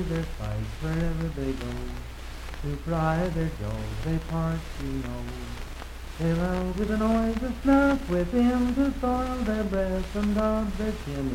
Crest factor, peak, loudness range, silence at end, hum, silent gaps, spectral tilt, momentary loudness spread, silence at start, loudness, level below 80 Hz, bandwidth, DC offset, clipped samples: 18 dB; -10 dBFS; 6 LU; 0 s; none; none; -7 dB/octave; 13 LU; 0 s; -28 LUFS; -36 dBFS; 16.5 kHz; under 0.1%; under 0.1%